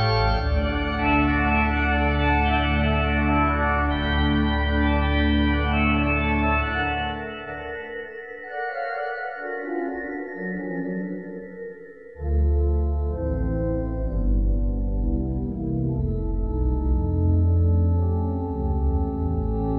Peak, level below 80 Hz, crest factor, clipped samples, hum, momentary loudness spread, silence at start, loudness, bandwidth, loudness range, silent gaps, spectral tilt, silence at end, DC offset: -8 dBFS; -26 dBFS; 14 dB; under 0.1%; none; 12 LU; 0 s; -24 LUFS; 5.6 kHz; 9 LU; none; -9.5 dB/octave; 0 s; 0.2%